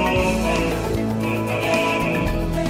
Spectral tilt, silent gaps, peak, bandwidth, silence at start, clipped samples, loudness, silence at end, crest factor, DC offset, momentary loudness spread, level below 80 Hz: -5.5 dB/octave; none; -6 dBFS; 16 kHz; 0 s; under 0.1%; -21 LUFS; 0 s; 14 dB; under 0.1%; 4 LU; -32 dBFS